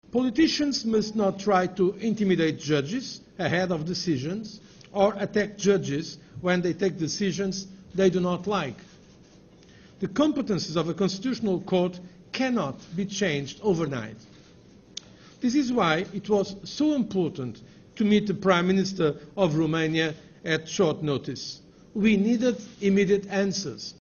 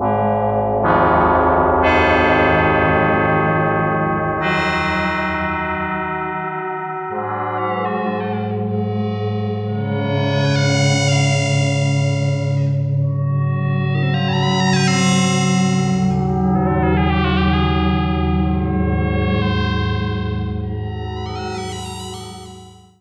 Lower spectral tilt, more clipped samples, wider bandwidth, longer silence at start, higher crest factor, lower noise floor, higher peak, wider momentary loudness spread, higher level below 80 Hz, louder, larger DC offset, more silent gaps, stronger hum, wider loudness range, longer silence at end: about the same, -5.5 dB/octave vs -6 dB/octave; neither; second, 7.2 kHz vs 10.5 kHz; first, 0.15 s vs 0 s; about the same, 18 dB vs 14 dB; first, -53 dBFS vs -40 dBFS; second, -8 dBFS vs -2 dBFS; first, 13 LU vs 10 LU; second, -58 dBFS vs -32 dBFS; second, -26 LUFS vs -18 LUFS; neither; neither; neither; second, 4 LU vs 7 LU; second, 0.1 s vs 0.25 s